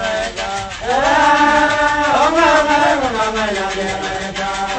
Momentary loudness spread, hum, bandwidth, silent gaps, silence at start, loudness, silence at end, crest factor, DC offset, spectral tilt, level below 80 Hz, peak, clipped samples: 10 LU; none; 9.2 kHz; none; 0 s; -15 LUFS; 0 s; 14 dB; under 0.1%; -3 dB/octave; -38 dBFS; -2 dBFS; under 0.1%